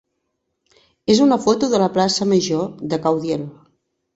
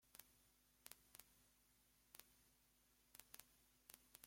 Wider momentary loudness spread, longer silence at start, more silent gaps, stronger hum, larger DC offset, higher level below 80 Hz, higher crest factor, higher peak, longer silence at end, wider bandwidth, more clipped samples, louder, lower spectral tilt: first, 10 LU vs 4 LU; first, 1.1 s vs 0 s; neither; second, none vs 50 Hz at -85 dBFS; neither; first, -56 dBFS vs -86 dBFS; second, 18 dB vs 38 dB; first, -2 dBFS vs -30 dBFS; first, 0.65 s vs 0 s; second, 8 kHz vs 16.5 kHz; neither; first, -18 LUFS vs -65 LUFS; first, -5 dB/octave vs -1 dB/octave